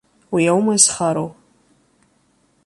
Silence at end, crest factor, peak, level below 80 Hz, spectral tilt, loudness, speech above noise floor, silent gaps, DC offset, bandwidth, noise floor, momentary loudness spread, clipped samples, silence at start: 1.35 s; 20 dB; 0 dBFS; -60 dBFS; -3.5 dB/octave; -16 LUFS; 44 dB; none; under 0.1%; 11.5 kHz; -61 dBFS; 12 LU; under 0.1%; 0.3 s